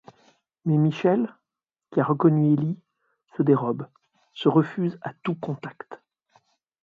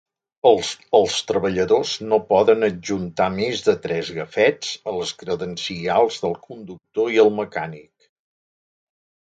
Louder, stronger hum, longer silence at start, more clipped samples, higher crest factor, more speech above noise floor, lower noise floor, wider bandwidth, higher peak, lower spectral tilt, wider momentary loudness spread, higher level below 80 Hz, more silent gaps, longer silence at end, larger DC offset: second, -24 LUFS vs -20 LUFS; neither; first, 0.65 s vs 0.45 s; neither; about the same, 20 dB vs 20 dB; second, 65 dB vs over 70 dB; about the same, -88 dBFS vs under -90 dBFS; second, 6.6 kHz vs 9.2 kHz; second, -6 dBFS vs 0 dBFS; first, -9.5 dB/octave vs -4.5 dB/octave; first, 18 LU vs 11 LU; second, -70 dBFS vs -56 dBFS; neither; second, 0.9 s vs 1.4 s; neither